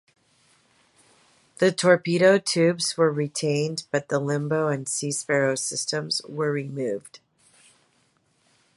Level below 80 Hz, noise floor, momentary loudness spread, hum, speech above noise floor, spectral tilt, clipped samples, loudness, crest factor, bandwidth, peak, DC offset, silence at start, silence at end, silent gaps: -74 dBFS; -66 dBFS; 9 LU; none; 43 dB; -4 dB/octave; under 0.1%; -24 LUFS; 22 dB; 11.5 kHz; -4 dBFS; under 0.1%; 1.6 s; 1.6 s; none